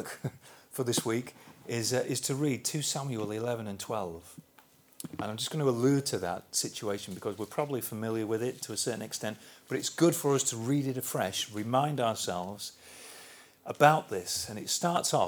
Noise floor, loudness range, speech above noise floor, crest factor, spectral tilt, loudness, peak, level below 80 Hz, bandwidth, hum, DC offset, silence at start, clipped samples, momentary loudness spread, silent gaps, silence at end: -61 dBFS; 4 LU; 30 dB; 26 dB; -4 dB/octave; -31 LUFS; -6 dBFS; -72 dBFS; over 20 kHz; none; under 0.1%; 0 s; under 0.1%; 16 LU; none; 0 s